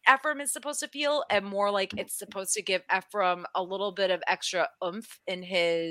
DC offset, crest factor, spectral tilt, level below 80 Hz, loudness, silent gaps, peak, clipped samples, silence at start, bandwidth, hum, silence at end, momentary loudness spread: under 0.1%; 26 dB; -2 dB/octave; -74 dBFS; -29 LUFS; none; -4 dBFS; under 0.1%; 0.05 s; 16 kHz; none; 0 s; 8 LU